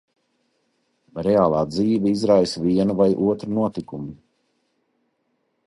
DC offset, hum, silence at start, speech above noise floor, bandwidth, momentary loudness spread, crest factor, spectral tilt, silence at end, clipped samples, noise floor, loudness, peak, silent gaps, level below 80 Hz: under 0.1%; none; 1.15 s; 51 dB; 11.5 kHz; 15 LU; 18 dB; -7.5 dB/octave; 1.5 s; under 0.1%; -71 dBFS; -20 LUFS; -4 dBFS; none; -54 dBFS